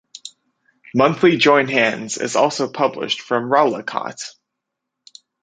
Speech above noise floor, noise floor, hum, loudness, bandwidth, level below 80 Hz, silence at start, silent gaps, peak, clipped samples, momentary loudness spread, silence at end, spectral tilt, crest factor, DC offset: 63 dB; -80 dBFS; none; -17 LUFS; 9.4 kHz; -64 dBFS; 0.25 s; none; 0 dBFS; under 0.1%; 19 LU; 1.1 s; -4 dB/octave; 18 dB; under 0.1%